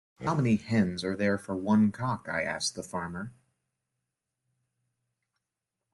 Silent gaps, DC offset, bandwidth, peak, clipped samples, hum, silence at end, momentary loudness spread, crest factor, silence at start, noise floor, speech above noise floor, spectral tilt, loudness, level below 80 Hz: none; under 0.1%; 12 kHz; -14 dBFS; under 0.1%; none; 2.6 s; 11 LU; 18 dB; 0.2 s; -87 dBFS; 59 dB; -5.5 dB/octave; -29 LUFS; -64 dBFS